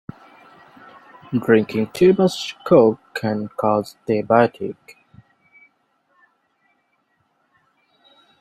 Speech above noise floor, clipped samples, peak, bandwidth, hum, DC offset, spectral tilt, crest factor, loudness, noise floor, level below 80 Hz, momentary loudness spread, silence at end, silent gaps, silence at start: 49 dB; under 0.1%; -2 dBFS; 14.5 kHz; none; under 0.1%; -6.5 dB/octave; 20 dB; -19 LUFS; -67 dBFS; -60 dBFS; 14 LU; 3.7 s; none; 1.3 s